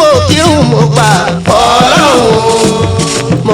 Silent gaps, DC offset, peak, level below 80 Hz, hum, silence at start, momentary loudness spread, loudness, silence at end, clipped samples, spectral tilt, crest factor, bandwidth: none; under 0.1%; 0 dBFS; -32 dBFS; none; 0 s; 5 LU; -7 LUFS; 0 s; 2%; -4.5 dB/octave; 8 dB; 17.5 kHz